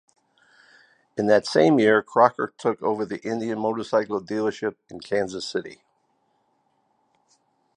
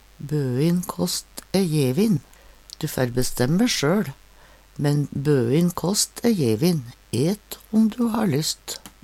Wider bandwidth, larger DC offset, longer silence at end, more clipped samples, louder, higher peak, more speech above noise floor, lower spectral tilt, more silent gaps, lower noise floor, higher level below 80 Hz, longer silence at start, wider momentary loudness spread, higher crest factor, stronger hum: second, 10.5 kHz vs 16.5 kHz; neither; first, 2 s vs 0.15 s; neither; about the same, -23 LUFS vs -23 LUFS; first, -2 dBFS vs -6 dBFS; first, 46 dB vs 29 dB; about the same, -5.5 dB/octave vs -5.5 dB/octave; neither; first, -69 dBFS vs -50 dBFS; second, -68 dBFS vs -46 dBFS; first, 1.15 s vs 0.2 s; first, 13 LU vs 9 LU; first, 22 dB vs 16 dB; neither